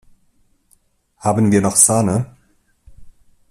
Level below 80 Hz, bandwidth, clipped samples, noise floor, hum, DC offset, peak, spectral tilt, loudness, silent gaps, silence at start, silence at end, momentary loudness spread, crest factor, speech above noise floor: -50 dBFS; 15.5 kHz; under 0.1%; -59 dBFS; none; under 0.1%; 0 dBFS; -5 dB/octave; -15 LUFS; none; 1.25 s; 0.4 s; 12 LU; 20 dB; 45 dB